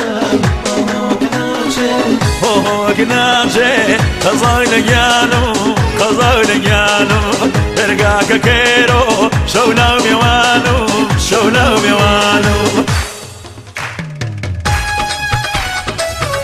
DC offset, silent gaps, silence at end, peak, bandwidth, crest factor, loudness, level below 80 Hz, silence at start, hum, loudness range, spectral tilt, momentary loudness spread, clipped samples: under 0.1%; none; 0 s; 0 dBFS; 15 kHz; 12 dB; -11 LUFS; -26 dBFS; 0 s; none; 5 LU; -4 dB/octave; 8 LU; under 0.1%